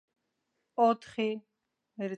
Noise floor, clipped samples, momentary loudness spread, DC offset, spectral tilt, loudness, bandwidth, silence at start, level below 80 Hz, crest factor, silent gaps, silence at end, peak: -81 dBFS; under 0.1%; 13 LU; under 0.1%; -6.5 dB/octave; -31 LUFS; 9 kHz; 0.8 s; -80 dBFS; 20 dB; none; 0 s; -14 dBFS